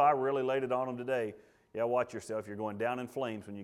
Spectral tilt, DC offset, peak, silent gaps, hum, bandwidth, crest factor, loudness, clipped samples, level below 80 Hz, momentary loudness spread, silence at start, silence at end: -6 dB/octave; under 0.1%; -14 dBFS; none; none; 14 kHz; 18 dB; -34 LUFS; under 0.1%; -76 dBFS; 8 LU; 0 s; 0 s